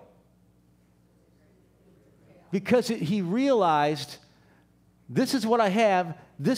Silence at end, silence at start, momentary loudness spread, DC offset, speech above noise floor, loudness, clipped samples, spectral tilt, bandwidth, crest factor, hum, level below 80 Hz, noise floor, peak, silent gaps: 0 s; 2.5 s; 12 LU; under 0.1%; 38 dB; -25 LUFS; under 0.1%; -5.5 dB/octave; 16 kHz; 16 dB; 60 Hz at -60 dBFS; -68 dBFS; -62 dBFS; -10 dBFS; none